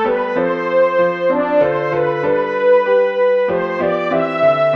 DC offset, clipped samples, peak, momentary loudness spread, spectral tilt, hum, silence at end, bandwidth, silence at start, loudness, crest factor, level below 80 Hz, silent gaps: under 0.1%; under 0.1%; -2 dBFS; 4 LU; -7.5 dB/octave; none; 0 s; 6 kHz; 0 s; -15 LUFS; 12 dB; -58 dBFS; none